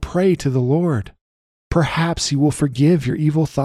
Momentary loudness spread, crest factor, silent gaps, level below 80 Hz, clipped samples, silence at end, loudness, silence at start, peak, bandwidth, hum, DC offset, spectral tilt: 5 LU; 14 dB; 1.21-1.71 s; -38 dBFS; under 0.1%; 0 s; -18 LUFS; 0 s; -4 dBFS; 13 kHz; none; under 0.1%; -6.5 dB/octave